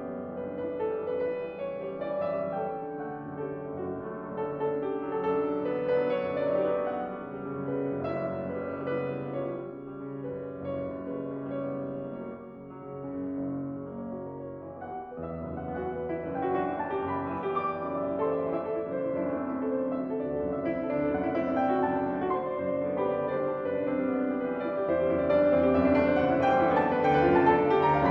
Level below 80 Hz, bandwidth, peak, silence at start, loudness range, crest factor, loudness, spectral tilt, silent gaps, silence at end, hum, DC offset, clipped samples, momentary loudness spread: -56 dBFS; 6 kHz; -10 dBFS; 0 s; 11 LU; 20 dB; -30 LUFS; -9 dB/octave; none; 0 s; none; under 0.1%; under 0.1%; 14 LU